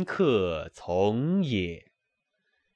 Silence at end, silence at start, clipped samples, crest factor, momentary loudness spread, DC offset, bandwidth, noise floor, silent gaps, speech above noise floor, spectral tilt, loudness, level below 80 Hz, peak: 0.95 s; 0 s; under 0.1%; 16 dB; 11 LU; under 0.1%; 9 kHz; -80 dBFS; none; 54 dB; -7.5 dB/octave; -27 LUFS; -56 dBFS; -12 dBFS